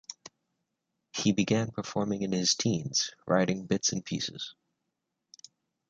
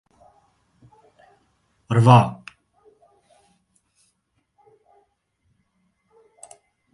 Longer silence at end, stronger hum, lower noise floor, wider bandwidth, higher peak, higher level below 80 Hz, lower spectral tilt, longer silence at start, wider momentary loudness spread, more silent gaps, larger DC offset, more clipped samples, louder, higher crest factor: second, 1.4 s vs 4.6 s; neither; first, -84 dBFS vs -71 dBFS; second, 9.2 kHz vs 11.5 kHz; second, -10 dBFS vs 0 dBFS; second, -66 dBFS vs -60 dBFS; second, -4 dB/octave vs -7.5 dB/octave; second, 0.1 s vs 1.9 s; second, 13 LU vs 32 LU; neither; neither; neither; second, -29 LUFS vs -17 LUFS; about the same, 22 dB vs 26 dB